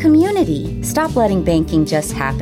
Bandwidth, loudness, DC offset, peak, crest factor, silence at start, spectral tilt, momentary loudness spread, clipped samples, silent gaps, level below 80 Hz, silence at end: 16 kHz; -16 LUFS; under 0.1%; -4 dBFS; 10 dB; 0 s; -6 dB/octave; 7 LU; under 0.1%; none; -32 dBFS; 0 s